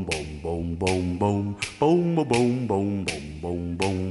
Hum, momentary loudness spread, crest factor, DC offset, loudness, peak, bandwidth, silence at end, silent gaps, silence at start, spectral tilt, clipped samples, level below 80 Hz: none; 9 LU; 18 dB; under 0.1%; -25 LUFS; -6 dBFS; 11.5 kHz; 0 s; none; 0 s; -6 dB/octave; under 0.1%; -46 dBFS